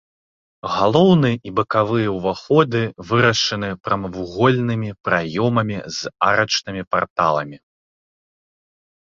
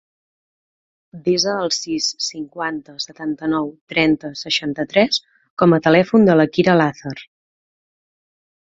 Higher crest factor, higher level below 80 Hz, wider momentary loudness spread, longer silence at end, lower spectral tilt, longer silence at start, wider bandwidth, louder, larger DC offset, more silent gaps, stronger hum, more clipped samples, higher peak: about the same, 20 dB vs 18 dB; first, -50 dBFS vs -56 dBFS; second, 9 LU vs 13 LU; first, 1.55 s vs 1.4 s; about the same, -5.5 dB/octave vs -4.5 dB/octave; second, 0.65 s vs 1.15 s; about the same, 7.6 kHz vs 7.8 kHz; about the same, -19 LUFS vs -18 LUFS; neither; about the same, 6.87-6.91 s, 7.10-7.16 s vs 3.81-3.87 s, 5.50-5.57 s; neither; neither; about the same, 0 dBFS vs -2 dBFS